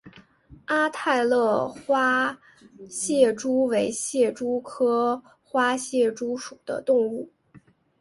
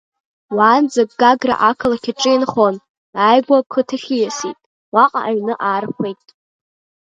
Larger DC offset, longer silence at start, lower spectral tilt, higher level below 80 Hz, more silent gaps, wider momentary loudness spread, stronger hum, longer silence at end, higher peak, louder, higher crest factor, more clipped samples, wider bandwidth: neither; second, 0.05 s vs 0.5 s; about the same, -3.5 dB/octave vs -4 dB/octave; second, -66 dBFS vs -58 dBFS; second, none vs 2.89-3.13 s, 3.66-3.70 s, 4.66-4.92 s; about the same, 12 LU vs 12 LU; neither; second, 0.45 s vs 0.9 s; second, -6 dBFS vs 0 dBFS; second, -24 LUFS vs -16 LUFS; about the same, 18 dB vs 16 dB; neither; first, 11.5 kHz vs 9 kHz